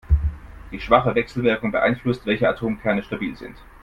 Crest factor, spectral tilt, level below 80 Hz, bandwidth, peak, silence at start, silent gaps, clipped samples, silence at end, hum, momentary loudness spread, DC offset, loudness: 22 dB; -8 dB/octave; -32 dBFS; 7.4 kHz; 0 dBFS; 0.1 s; none; under 0.1%; 0.2 s; none; 18 LU; under 0.1%; -22 LUFS